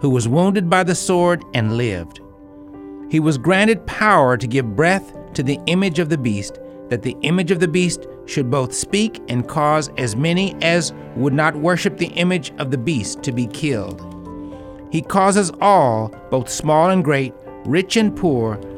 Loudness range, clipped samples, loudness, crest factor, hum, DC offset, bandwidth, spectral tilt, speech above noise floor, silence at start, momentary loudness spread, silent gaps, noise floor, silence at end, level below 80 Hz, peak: 3 LU; under 0.1%; -18 LUFS; 18 dB; none; under 0.1%; 14.5 kHz; -5 dB/octave; 22 dB; 0 s; 13 LU; none; -40 dBFS; 0 s; -46 dBFS; 0 dBFS